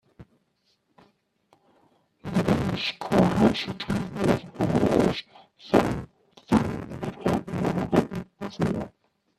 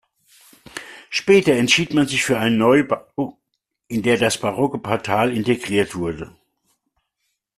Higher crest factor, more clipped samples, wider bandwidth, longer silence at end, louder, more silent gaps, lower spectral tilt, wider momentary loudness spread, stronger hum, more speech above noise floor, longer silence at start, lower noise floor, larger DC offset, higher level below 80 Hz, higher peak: first, 24 dB vs 18 dB; neither; about the same, 13.5 kHz vs 14 kHz; second, 0.5 s vs 1.3 s; second, -26 LUFS vs -19 LUFS; neither; first, -7 dB/octave vs -4.5 dB/octave; second, 13 LU vs 16 LU; neither; second, 47 dB vs 57 dB; second, 0.2 s vs 0.75 s; second, -71 dBFS vs -75 dBFS; neither; first, -48 dBFS vs -54 dBFS; about the same, -4 dBFS vs -2 dBFS